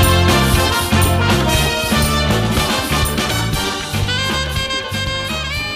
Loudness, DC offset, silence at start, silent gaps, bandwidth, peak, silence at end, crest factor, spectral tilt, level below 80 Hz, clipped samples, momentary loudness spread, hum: -16 LUFS; under 0.1%; 0 s; none; 15.5 kHz; -2 dBFS; 0 s; 14 dB; -4 dB/octave; -26 dBFS; under 0.1%; 6 LU; none